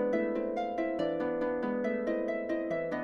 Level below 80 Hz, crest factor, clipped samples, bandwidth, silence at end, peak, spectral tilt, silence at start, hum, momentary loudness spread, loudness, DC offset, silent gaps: -62 dBFS; 14 dB; under 0.1%; 6.8 kHz; 0 s; -18 dBFS; -7.5 dB/octave; 0 s; none; 2 LU; -33 LUFS; under 0.1%; none